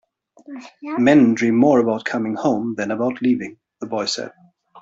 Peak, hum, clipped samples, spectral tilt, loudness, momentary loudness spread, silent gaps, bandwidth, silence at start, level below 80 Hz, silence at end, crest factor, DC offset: -2 dBFS; none; under 0.1%; -5.5 dB/octave; -19 LUFS; 21 LU; none; 7.8 kHz; 0.5 s; -62 dBFS; 0 s; 18 dB; under 0.1%